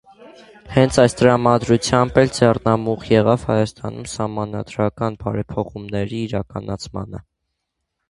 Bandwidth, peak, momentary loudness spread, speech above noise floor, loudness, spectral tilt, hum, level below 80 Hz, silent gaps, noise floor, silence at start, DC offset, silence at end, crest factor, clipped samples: 11.5 kHz; 0 dBFS; 14 LU; 58 dB; -19 LUFS; -6 dB/octave; none; -44 dBFS; none; -77 dBFS; 0.2 s; under 0.1%; 0.9 s; 20 dB; under 0.1%